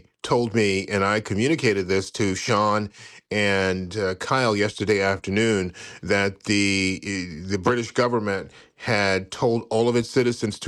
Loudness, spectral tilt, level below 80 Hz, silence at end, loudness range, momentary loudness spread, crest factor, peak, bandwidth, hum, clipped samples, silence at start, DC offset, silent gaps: -23 LUFS; -5 dB/octave; -58 dBFS; 0 s; 1 LU; 7 LU; 16 dB; -6 dBFS; 12.5 kHz; none; under 0.1%; 0.25 s; under 0.1%; none